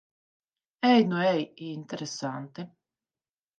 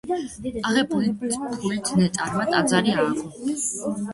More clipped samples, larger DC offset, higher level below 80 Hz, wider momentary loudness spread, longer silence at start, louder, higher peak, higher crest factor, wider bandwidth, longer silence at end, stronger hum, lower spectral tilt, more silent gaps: neither; neither; second, -80 dBFS vs -54 dBFS; first, 19 LU vs 8 LU; first, 0.8 s vs 0.05 s; second, -27 LUFS vs -23 LUFS; second, -10 dBFS vs -4 dBFS; about the same, 20 dB vs 18 dB; second, 8.8 kHz vs 11.5 kHz; first, 0.9 s vs 0 s; neither; about the same, -5.5 dB/octave vs -4.5 dB/octave; neither